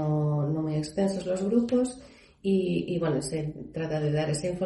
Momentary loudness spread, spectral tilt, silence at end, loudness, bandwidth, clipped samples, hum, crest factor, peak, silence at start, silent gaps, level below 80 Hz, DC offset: 8 LU; -7 dB/octave; 0 s; -28 LUFS; 11.5 kHz; under 0.1%; none; 16 dB; -12 dBFS; 0 s; none; -56 dBFS; under 0.1%